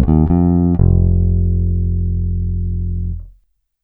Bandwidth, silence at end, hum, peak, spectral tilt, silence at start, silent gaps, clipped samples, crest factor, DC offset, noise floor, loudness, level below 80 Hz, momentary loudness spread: 1.9 kHz; 0.55 s; none; -2 dBFS; -14.5 dB/octave; 0 s; none; under 0.1%; 14 dB; under 0.1%; -56 dBFS; -16 LUFS; -20 dBFS; 9 LU